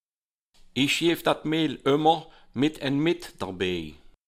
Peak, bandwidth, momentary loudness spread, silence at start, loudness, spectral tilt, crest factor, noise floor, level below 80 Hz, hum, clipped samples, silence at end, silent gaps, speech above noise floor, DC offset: -8 dBFS; 15.5 kHz; 12 LU; 0.75 s; -26 LUFS; -5 dB/octave; 20 dB; under -90 dBFS; -56 dBFS; none; under 0.1%; 0.35 s; none; over 65 dB; under 0.1%